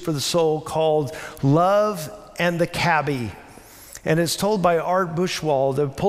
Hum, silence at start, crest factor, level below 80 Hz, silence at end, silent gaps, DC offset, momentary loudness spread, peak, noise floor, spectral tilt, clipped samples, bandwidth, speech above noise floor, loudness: none; 0 s; 16 dB; -52 dBFS; 0 s; none; under 0.1%; 11 LU; -6 dBFS; -44 dBFS; -5 dB/octave; under 0.1%; 16 kHz; 23 dB; -21 LUFS